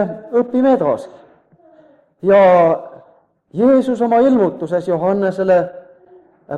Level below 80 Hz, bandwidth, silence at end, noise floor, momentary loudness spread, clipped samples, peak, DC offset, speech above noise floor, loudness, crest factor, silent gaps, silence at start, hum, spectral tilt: -58 dBFS; 9 kHz; 0 s; -52 dBFS; 11 LU; under 0.1%; -2 dBFS; under 0.1%; 39 dB; -15 LUFS; 14 dB; none; 0 s; none; -8.5 dB/octave